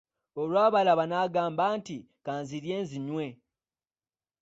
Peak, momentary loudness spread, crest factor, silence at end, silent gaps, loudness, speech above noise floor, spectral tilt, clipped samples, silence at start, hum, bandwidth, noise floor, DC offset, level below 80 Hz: -12 dBFS; 15 LU; 18 dB; 1.05 s; none; -28 LUFS; over 62 dB; -6 dB/octave; under 0.1%; 0.35 s; none; 8 kHz; under -90 dBFS; under 0.1%; -74 dBFS